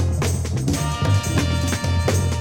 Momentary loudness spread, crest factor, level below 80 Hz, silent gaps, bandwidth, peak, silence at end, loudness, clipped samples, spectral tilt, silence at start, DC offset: 3 LU; 12 dB; -30 dBFS; none; 17.5 kHz; -8 dBFS; 0 s; -21 LUFS; under 0.1%; -5 dB/octave; 0 s; under 0.1%